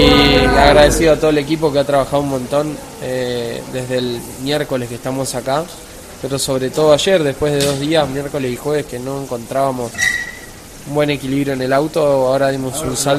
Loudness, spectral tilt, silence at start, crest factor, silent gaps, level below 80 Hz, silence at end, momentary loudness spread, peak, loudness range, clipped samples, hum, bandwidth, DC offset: -16 LUFS; -4.5 dB/octave; 0 s; 16 dB; none; -32 dBFS; 0 s; 14 LU; 0 dBFS; 6 LU; under 0.1%; none; 15 kHz; under 0.1%